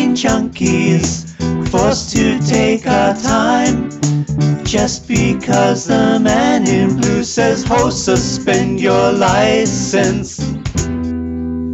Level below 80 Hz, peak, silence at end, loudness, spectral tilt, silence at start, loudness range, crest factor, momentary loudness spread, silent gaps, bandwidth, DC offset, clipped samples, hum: -34 dBFS; -2 dBFS; 0 s; -14 LUFS; -5 dB/octave; 0 s; 1 LU; 10 dB; 8 LU; none; 8.4 kHz; under 0.1%; under 0.1%; none